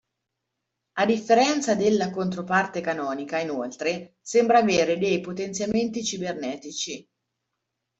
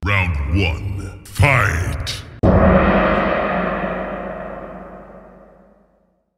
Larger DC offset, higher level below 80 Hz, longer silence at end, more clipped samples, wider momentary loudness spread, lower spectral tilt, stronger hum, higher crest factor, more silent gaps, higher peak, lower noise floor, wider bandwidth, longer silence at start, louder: neither; second, -64 dBFS vs -28 dBFS; about the same, 1 s vs 1.1 s; neither; second, 12 LU vs 18 LU; second, -4 dB/octave vs -6.5 dB/octave; neither; about the same, 18 dB vs 18 dB; neither; second, -8 dBFS vs 0 dBFS; first, -82 dBFS vs -61 dBFS; second, 8.2 kHz vs 15 kHz; first, 0.95 s vs 0 s; second, -24 LUFS vs -18 LUFS